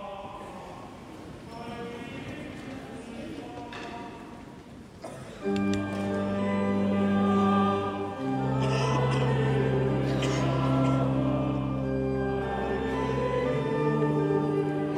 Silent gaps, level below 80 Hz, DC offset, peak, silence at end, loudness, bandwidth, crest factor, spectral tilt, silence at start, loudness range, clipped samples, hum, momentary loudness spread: none; -48 dBFS; under 0.1%; -12 dBFS; 0 s; -28 LUFS; 10.5 kHz; 16 dB; -7.5 dB/octave; 0 s; 14 LU; under 0.1%; none; 17 LU